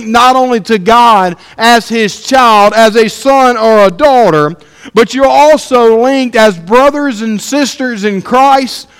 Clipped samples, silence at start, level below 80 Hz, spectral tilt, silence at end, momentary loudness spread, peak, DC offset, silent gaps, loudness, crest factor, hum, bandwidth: 3%; 0 s; -42 dBFS; -4 dB/octave; 0.15 s; 8 LU; 0 dBFS; under 0.1%; none; -7 LUFS; 8 dB; none; 16.5 kHz